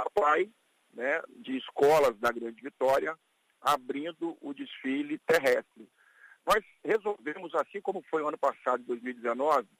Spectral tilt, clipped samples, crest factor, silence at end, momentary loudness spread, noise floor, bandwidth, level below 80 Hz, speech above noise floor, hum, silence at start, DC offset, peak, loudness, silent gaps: -4 dB/octave; under 0.1%; 18 dB; 0.15 s; 12 LU; -59 dBFS; 15.5 kHz; -66 dBFS; 29 dB; none; 0 s; under 0.1%; -12 dBFS; -30 LUFS; none